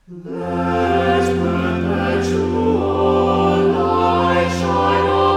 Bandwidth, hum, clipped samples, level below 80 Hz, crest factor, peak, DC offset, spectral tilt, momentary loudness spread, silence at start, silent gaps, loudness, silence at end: 11.5 kHz; none; under 0.1%; -38 dBFS; 12 dB; -4 dBFS; under 0.1%; -6.5 dB/octave; 4 LU; 0.1 s; none; -17 LUFS; 0 s